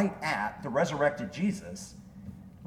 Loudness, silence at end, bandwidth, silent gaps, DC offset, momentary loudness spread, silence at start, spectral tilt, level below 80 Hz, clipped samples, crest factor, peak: -31 LUFS; 0 s; 14.5 kHz; none; under 0.1%; 19 LU; 0 s; -5.5 dB/octave; -60 dBFS; under 0.1%; 18 dB; -14 dBFS